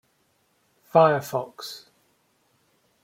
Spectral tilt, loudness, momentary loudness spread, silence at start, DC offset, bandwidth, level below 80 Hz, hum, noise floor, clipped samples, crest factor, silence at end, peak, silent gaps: -5.5 dB/octave; -22 LUFS; 19 LU; 0.95 s; under 0.1%; 16.5 kHz; -70 dBFS; none; -68 dBFS; under 0.1%; 22 dB; 1.25 s; -4 dBFS; none